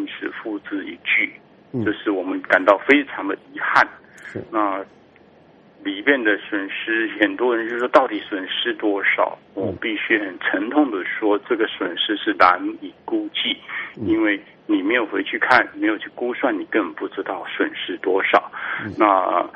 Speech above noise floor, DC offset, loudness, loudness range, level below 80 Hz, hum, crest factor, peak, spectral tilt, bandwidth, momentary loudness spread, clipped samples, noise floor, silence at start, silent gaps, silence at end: 30 dB; under 0.1%; -20 LUFS; 2 LU; -62 dBFS; none; 22 dB; 0 dBFS; -5.5 dB/octave; 7.6 kHz; 12 LU; under 0.1%; -50 dBFS; 0 s; none; 0.05 s